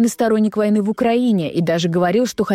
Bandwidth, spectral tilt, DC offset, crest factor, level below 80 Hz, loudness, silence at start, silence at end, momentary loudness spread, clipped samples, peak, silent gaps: 16 kHz; -6 dB/octave; under 0.1%; 10 dB; -56 dBFS; -17 LUFS; 0 s; 0 s; 2 LU; under 0.1%; -6 dBFS; none